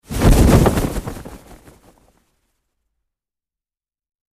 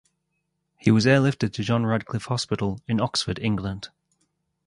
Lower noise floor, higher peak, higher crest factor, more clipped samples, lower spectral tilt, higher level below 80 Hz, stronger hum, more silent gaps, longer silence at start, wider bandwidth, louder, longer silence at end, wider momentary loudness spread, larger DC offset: first, under -90 dBFS vs -77 dBFS; first, 0 dBFS vs -4 dBFS; about the same, 20 dB vs 22 dB; neither; about the same, -6.5 dB/octave vs -6 dB/octave; first, -24 dBFS vs -52 dBFS; neither; neither; second, 0.1 s vs 0.85 s; first, 15.5 kHz vs 11.5 kHz; first, -15 LUFS vs -24 LUFS; first, 2.95 s vs 0.8 s; first, 22 LU vs 10 LU; neither